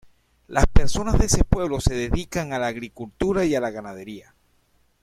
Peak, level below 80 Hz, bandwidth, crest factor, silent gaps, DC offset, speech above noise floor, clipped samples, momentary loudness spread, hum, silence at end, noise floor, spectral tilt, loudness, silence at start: -2 dBFS; -26 dBFS; 14.5 kHz; 20 dB; none; under 0.1%; 42 dB; under 0.1%; 16 LU; none; 0.85 s; -64 dBFS; -5 dB/octave; -23 LUFS; 0.5 s